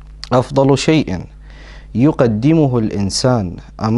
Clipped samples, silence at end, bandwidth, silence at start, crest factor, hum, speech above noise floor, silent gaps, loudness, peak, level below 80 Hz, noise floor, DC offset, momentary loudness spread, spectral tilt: under 0.1%; 0 s; 11.5 kHz; 0 s; 16 dB; none; 21 dB; none; -15 LUFS; 0 dBFS; -36 dBFS; -35 dBFS; under 0.1%; 11 LU; -6.5 dB/octave